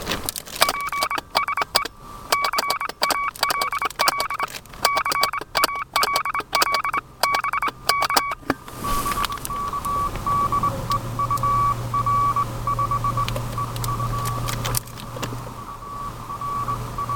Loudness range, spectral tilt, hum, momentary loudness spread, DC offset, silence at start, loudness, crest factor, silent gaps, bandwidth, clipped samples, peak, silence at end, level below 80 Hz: 4 LU; -3 dB/octave; none; 9 LU; under 0.1%; 0 s; -23 LUFS; 24 dB; none; 17.5 kHz; under 0.1%; 0 dBFS; 0 s; -40 dBFS